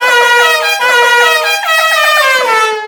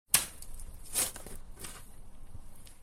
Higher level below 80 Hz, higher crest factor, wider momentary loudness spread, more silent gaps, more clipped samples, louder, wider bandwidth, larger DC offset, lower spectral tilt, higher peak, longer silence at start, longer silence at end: second, -60 dBFS vs -48 dBFS; second, 10 dB vs 32 dB; second, 3 LU vs 25 LU; neither; first, 0.4% vs under 0.1%; first, -7 LUFS vs -33 LUFS; first, over 20 kHz vs 17 kHz; neither; second, 2.5 dB/octave vs 0 dB/octave; first, 0 dBFS vs -6 dBFS; about the same, 0 s vs 0.1 s; about the same, 0 s vs 0 s